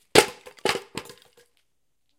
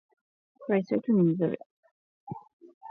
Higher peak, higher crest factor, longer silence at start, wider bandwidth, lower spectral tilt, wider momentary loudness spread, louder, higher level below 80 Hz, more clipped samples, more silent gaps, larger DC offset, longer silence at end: first, 0 dBFS vs -14 dBFS; first, 28 dB vs 16 dB; second, 0.15 s vs 0.6 s; first, 17 kHz vs 4.8 kHz; second, -2 dB/octave vs -11 dB/octave; about the same, 19 LU vs 20 LU; first, -24 LUFS vs -27 LUFS; first, -56 dBFS vs -76 dBFS; neither; second, none vs 1.66-1.83 s, 1.91-2.27 s, 2.53-2.60 s, 2.74-2.81 s; neither; first, 1.15 s vs 0 s